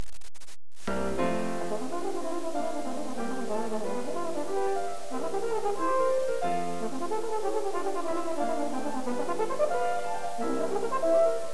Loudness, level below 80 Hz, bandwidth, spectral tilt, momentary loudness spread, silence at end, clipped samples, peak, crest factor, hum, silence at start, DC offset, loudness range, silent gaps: -31 LUFS; -58 dBFS; 11 kHz; -5 dB/octave; 7 LU; 0 s; under 0.1%; -14 dBFS; 16 dB; none; 0 s; 3%; 3 LU; none